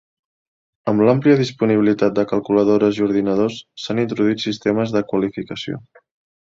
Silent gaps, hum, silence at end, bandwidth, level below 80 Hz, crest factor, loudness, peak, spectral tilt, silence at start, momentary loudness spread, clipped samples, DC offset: none; none; 0.7 s; 7.6 kHz; -56 dBFS; 16 dB; -18 LUFS; -2 dBFS; -7 dB/octave; 0.85 s; 13 LU; under 0.1%; under 0.1%